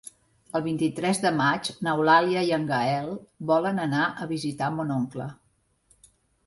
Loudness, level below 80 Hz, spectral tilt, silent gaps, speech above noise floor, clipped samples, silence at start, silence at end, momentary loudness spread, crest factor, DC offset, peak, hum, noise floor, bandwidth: -25 LUFS; -64 dBFS; -5.5 dB/octave; none; 43 dB; under 0.1%; 0.05 s; 1.15 s; 12 LU; 18 dB; under 0.1%; -8 dBFS; none; -68 dBFS; 11.5 kHz